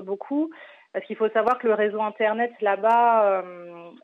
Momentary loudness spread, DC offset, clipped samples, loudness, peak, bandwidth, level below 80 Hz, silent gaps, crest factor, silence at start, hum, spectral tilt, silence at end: 16 LU; under 0.1%; under 0.1%; -23 LUFS; -10 dBFS; 5.4 kHz; -76 dBFS; none; 14 dB; 0 s; none; -7 dB/octave; 0.15 s